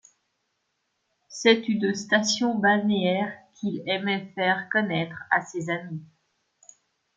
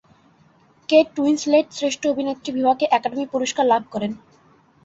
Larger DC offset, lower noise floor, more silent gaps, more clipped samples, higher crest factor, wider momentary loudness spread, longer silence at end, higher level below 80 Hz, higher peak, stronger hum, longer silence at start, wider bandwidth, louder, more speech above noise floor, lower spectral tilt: neither; first, -76 dBFS vs -56 dBFS; neither; neither; first, 24 dB vs 18 dB; about the same, 11 LU vs 10 LU; first, 1.1 s vs 0.7 s; second, -72 dBFS vs -64 dBFS; about the same, -4 dBFS vs -4 dBFS; neither; first, 1.3 s vs 0.9 s; first, 9 kHz vs 8 kHz; second, -25 LUFS vs -20 LUFS; first, 51 dB vs 36 dB; about the same, -4 dB/octave vs -4 dB/octave